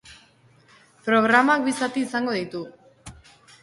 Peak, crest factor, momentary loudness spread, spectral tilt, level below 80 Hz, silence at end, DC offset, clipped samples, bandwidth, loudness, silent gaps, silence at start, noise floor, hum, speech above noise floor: -4 dBFS; 22 dB; 16 LU; -4 dB/octave; -60 dBFS; 0.5 s; under 0.1%; under 0.1%; 11.5 kHz; -22 LUFS; none; 0.05 s; -56 dBFS; none; 35 dB